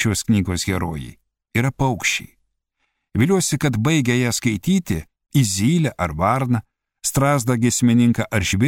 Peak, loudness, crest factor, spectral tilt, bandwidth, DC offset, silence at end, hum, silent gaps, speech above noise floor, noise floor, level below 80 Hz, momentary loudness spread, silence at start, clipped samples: -4 dBFS; -19 LUFS; 16 dB; -5 dB/octave; 16.5 kHz; under 0.1%; 0 s; none; none; 54 dB; -73 dBFS; -42 dBFS; 8 LU; 0 s; under 0.1%